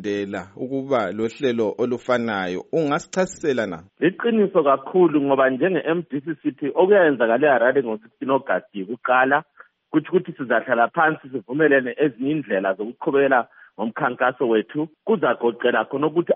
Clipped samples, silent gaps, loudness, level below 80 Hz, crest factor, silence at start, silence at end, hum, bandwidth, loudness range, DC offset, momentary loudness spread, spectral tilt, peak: under 0.1%; none; -21 LUFS; -68 dBFS; 16 dB; 0 s; 0 s; none; 8 kHz; 4 LU; under 0.1%; 10 LU; -4.5 dB/octave; -4 dBFS